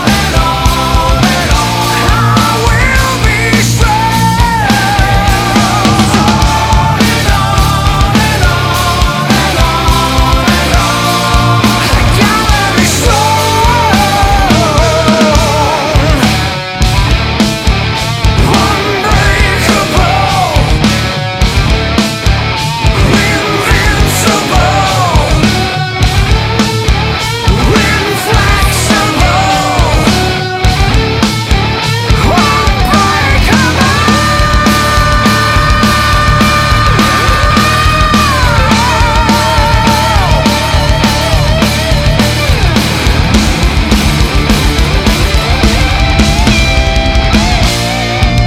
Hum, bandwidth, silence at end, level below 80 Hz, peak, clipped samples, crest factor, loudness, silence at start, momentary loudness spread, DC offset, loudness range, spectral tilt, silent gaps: none; 16.5 kHz; 0 s; -14 dBFS; 0 dBFS; under 0.1%; 8 dB; -9 LUFS; 0 s; 3 LU; under 0.1%; 2 LU; -4.5 dB/octave; none